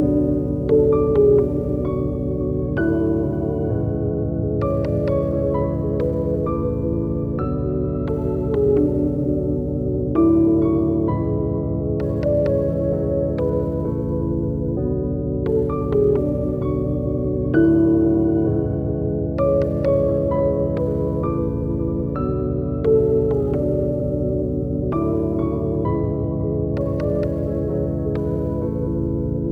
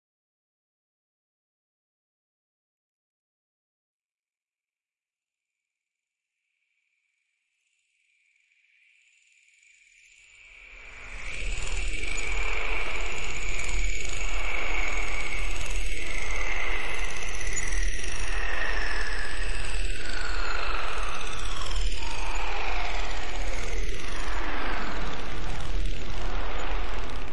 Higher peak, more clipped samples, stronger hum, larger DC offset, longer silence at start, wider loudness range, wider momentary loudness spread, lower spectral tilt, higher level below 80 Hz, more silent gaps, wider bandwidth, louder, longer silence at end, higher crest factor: first, -6 dBFS vs -12 dBFS; neither; neither; first, 0.1% vs under 0.1%; second, 0 s vs 2.95 s; second, 3 LU vs 18 LU; second, 6 LU vs 13 LU; first, -11.5 dB/octave vs -3 dB/octave; about the same, -32 dBFS vs -34 dBFS; neither; second, 4.9 kHz vs 11.5 kHz; first, -21 LUFS vs -32 LUFS; about the same, 0 s vs 0 s; about the same, 14 dB vs 10 dB